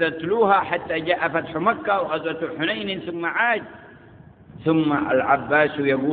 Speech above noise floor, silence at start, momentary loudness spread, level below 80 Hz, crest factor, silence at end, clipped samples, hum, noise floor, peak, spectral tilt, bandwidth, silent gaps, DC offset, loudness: 25 dB; 0 s; 8 LU; -58 dBFS; 18 dB; 0 s; under 0.1%; none; -47 dBFS; -4 dBFS; -10.5 dB/octave; 4.6 kHz; none; under 0.1%; -22 LUFS